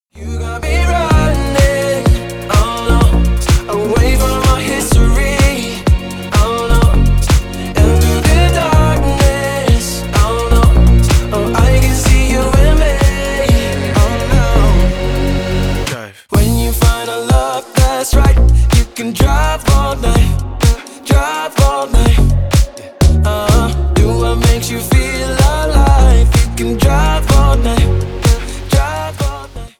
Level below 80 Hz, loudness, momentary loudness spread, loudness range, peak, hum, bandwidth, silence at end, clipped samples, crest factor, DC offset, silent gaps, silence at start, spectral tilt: -14 dBFS; -13 LUFS; 6 LU; 2 LU; 0 dBFS; none; 17.5 kHz; 0.1 s; under 0.1%; 10 dB; under 0.1%; none; 0.15 s; -5.5 dB/octave